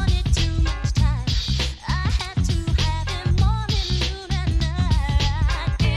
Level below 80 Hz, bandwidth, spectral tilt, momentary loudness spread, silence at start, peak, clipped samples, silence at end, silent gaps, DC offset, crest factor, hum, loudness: -24 dBFS; 11.5 kHz; -5 dB/octave; 4 LU; 0 s; -8 dBFS; under 0.1%; 0 s; none; under 0.1%; 14 dB; none; -22 LUFS